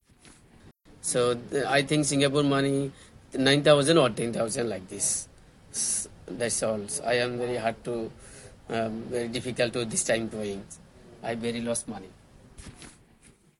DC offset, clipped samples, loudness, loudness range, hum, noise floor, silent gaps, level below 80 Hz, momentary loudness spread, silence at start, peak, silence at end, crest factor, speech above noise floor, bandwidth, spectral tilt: under 0.1%; under 0.1%; -27 LUFS; 7 LU; none; -58 dBFS; none; -58 dBFS; 18 LU; 0.25 s; -6 dBFS; 0.7 s; 22 dB; 31 dB; 12 kHz; -3.5 dB/octave